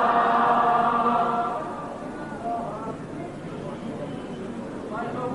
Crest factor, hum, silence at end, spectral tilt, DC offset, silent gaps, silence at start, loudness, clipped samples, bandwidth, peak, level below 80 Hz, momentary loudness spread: 16 dB; none; 0 s; -6.5 dB/octave; under 0.1%; none; 0 s; -26 LUFS; under 0.1%; 11.5 kHz; -10 dBFS; -54 dBFS; 15 LU